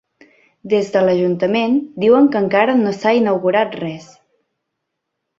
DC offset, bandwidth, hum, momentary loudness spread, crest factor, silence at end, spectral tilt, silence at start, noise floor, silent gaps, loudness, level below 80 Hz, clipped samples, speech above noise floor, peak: under 0.1%; 7.8 kHz; none; 8 LU; 14 dB; 1.35 s; -7 dB/octave; 0.65 s; -76 dBFS; none; -16 LUFS; -62 dBFS; under 0.1%; 61 dB; -2 dBFS